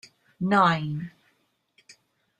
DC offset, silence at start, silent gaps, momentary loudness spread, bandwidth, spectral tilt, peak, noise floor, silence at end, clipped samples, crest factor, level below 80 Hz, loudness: under 0.1%; 0.4 s; none; 16 LU; 9.8 kHz; -6.5 dB/octave; -6 dBFS; -70 dBFS; 1.3 s; under 0.1%; 22 dB; -66 dBFS; -24 LUFS